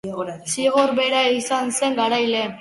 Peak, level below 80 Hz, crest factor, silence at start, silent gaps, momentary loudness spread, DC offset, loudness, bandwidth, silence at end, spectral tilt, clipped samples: -4 dBFS; -64 dBFS; 16 dB; 0.05 s; none; 7 LU; under 0.1%; -20 LUFS; 11.5 kHz; 0 s; -2.5 dB/octave; under 0.1%